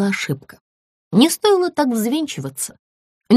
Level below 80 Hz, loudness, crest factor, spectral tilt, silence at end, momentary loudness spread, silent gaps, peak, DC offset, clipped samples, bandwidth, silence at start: -64 dBFS; -19 LUFS; 18 dB; -4.5 dB/octave; 0 s; 13 LU; 0.61-1.11 s, 2.79-3.21 s; -2 dBFS; under 0.1%; under 0.1%; 15.5 kHz; 0 s